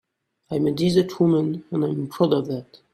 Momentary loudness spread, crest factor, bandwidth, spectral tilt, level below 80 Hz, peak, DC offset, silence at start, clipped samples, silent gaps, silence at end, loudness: 9 LU; 16 dB; 14 kHz; -7.5 dB/octave; -60 dBFS; -6 dBFS; under 0.1%; 0.5 s; under 0.1%; none; 0.2 s; -22 LUFS